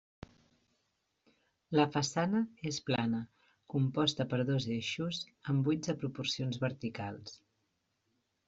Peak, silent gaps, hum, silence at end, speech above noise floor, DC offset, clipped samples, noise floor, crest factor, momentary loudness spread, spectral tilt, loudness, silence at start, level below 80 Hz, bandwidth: -14 dBFS; none; none; 1.1 s; 47 dB; under 0.1%; under 0.1%; -81 dBFS; 22 dB; 9 LU; -5.5 dB/octave; -34 LUFS; 1.7 s; -70 dBFS; 8 kHz